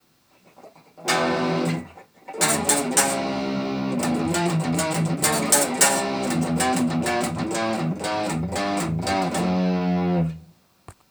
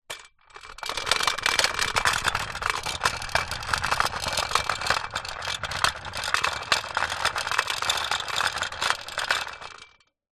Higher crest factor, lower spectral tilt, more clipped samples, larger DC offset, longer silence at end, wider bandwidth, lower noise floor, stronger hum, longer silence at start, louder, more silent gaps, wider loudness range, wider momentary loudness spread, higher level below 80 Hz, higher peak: about the same, 22 dB vs 24 dB; first, -4 dB/octave vs -0.5 dB/octave; neither; neither; second, 0.2 s vs 0.45 s; first, over 20 kHz vs 13 kHz; first, -58 dBFS vs -54 dBFS; neither; first, 0.6 s vs 0.1 s; first, -22 LUFS vs -25 LUFS; neither; about the same, 3 LU vs 2 LU; about the same, 8 LU vs 9 LU; second, -56 dBFS vs -48 dBFS; first, 0 dBFS vs -4 dBFS